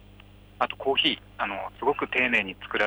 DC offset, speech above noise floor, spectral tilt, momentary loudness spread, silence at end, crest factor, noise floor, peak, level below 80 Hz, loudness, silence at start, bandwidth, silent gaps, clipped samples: under 0.1%; 24 dB; -4.5 dB/octave; 9 LU; 0 s; 18 dB; -50 dBFS; -10 dBFS; -56 dBFS; -26 LUFS; 0.2 s; over 20 kHz; none; under 0.1%